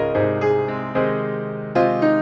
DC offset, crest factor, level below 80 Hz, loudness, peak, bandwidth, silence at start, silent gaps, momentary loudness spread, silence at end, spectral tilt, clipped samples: under 0.1%; 14 dB; -52 dBFS; -21 LUFS; -6 dBFS; 7 kHz; 0 s; none; 7 LU; 0 s; -8.5 dB/octave; under 0.1%